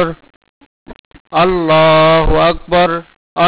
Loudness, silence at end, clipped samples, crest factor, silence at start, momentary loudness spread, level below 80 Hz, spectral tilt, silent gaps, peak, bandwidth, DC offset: -11 LUFS; 0 s; under 0.1%; 6 dB; 0 s; 11 LU; -28 dBFS; -9.5 dB/octave; 0.36-0.41 s, 0.49-0.86 s, 0.99-1.11 s, 1.20-1.25 s, 3.16-3.36 s; -6 dBFS; 4 kHz; under 0.1%